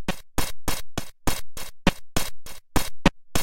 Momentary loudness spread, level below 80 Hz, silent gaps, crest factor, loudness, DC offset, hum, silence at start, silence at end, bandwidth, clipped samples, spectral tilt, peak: 10 LU; -34 dBFS; none; 20 dB; -28 LUFS; under 0.1%; none; 0 s; 0 s; 17 kHz; under 0.1%; -4 dB/octave; -2 dBFS